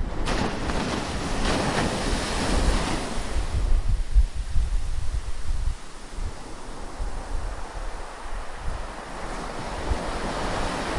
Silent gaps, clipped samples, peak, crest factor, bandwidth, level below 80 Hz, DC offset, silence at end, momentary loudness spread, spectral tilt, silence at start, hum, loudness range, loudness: none; under 0.1%; -8 dBFS; 16 dB; 11.5 kHz; -28 dBFS; under 0.1%; 0 s; 12 LU; -4.5 dB/octave; 0 s; none; 10 LU; -29 LUFS